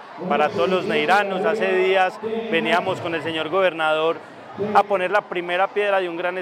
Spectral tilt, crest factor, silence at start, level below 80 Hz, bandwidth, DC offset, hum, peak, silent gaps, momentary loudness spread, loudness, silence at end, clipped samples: -5 dB/octave; 18 dB; 0 s; -74 dBFS; 15 kHz; under 0.1%; none; -2 dBFS; none; 6 LU; -21 LUFS; 0 s; under 0.1%